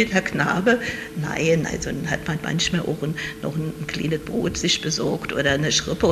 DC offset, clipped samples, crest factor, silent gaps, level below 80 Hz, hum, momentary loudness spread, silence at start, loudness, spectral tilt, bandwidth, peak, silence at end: under 0.1%; under 0.1%; 20 dB; none; -44 dBFS; none; 8 LU; 0 s; -23 LUFS; -4 dB/octave; 14 kHz; -2 dBFS; 0 s